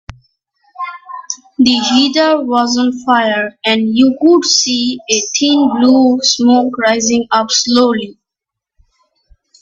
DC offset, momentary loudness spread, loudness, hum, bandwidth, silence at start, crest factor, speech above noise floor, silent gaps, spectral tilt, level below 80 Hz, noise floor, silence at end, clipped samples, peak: under 0.1%; 15 LU; -11 LUFS; none; 7.8 kHz; 0.8 s; 12 dB; 70 dB; none; -2.5 dB/octave; -52 dBFS; -82 dBFS; 1.5 s; under 0.1%; 0 dBFS